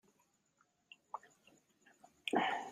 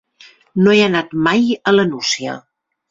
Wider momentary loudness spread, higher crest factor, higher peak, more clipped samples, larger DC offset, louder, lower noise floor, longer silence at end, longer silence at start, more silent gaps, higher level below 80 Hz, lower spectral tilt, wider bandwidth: first, 26 LU vs 13 LU; first, 26 dB vs 16 dB; second, -20 dBFS vs 0 dBFS; neither; neither; second, -40 LUFS vs -15 LUFS; first, -78 dBFS vs -47 dBFS; second, 0 s vs 0.5 s; first, 1.15 s vs 0.55 s; neither; second, -88 dBFS vs -56 dBFS; about the same, -3.5 dB/octave vs -4.5 dB/octave; first, 15.5 kHz vs 7.8 kHz